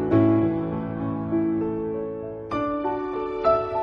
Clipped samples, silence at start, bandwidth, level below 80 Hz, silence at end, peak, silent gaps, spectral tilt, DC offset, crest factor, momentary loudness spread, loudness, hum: under 0.1%; 0 s; 5.2 kHz; -48 dBFS; 0 s; -6 dBFS; none; -10 dB/octave; under 0.1%; 16 dB; 10 LU; -25 LUFS; none